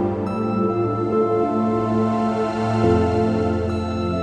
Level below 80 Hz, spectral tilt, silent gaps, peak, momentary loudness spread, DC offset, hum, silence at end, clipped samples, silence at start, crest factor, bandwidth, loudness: -42 dBFS; -8.5 dB/octave; none; -6 dBFS; 5 LU; under 0.1%; none; 0 s; under 0.1%; 0 s; 14 dB; 9.4 kHz; -21 LUFS